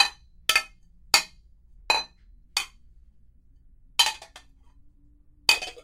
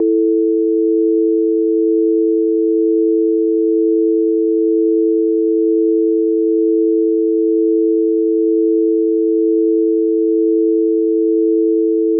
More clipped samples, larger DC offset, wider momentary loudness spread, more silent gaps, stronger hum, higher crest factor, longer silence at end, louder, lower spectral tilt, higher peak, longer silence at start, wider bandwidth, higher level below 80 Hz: neither; neither; first, 18 LU vs 1 LU; neither; neither; first, 28 dB vs 6 dB; about the same, 0.05 s vs 0 s; second, -24 LUFS vs -14 LUFS; second, 1.5 dB/octave vs -15.5 dB/octave; first, 0 dBFS vs -6 dBFS; about the same, 0 s vs 0 s; first, 16 kHz vs 0.5 kHz; first, -54 dBFS vs under -90 dBFS